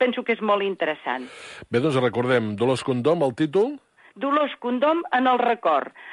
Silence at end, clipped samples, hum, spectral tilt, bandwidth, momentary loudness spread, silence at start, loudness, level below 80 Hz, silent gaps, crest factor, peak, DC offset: 0 s; under 0.1%; none; -6.5 dB/octave; 11.5 kHz; 8 LU; 0 s; -23 LUFS; -64 dBFS; none; 14 dB; -8 dBFS; under 0.1%